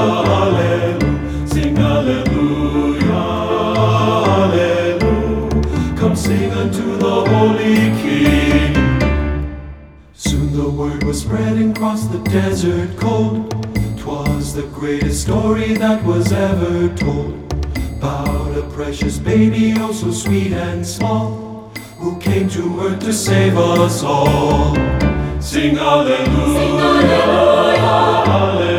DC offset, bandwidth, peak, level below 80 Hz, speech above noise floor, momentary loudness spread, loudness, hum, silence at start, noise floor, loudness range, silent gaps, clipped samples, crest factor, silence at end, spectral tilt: under 0.1%; 19.5 kHz; 0 dBFS; -26 dBFS; 23 dB; 9 LU; -15 LUFS; none; 0 s; -38 dBFS; 5 LU; none; under 0.1%; 14 dB; 0 s; -6 dB/octave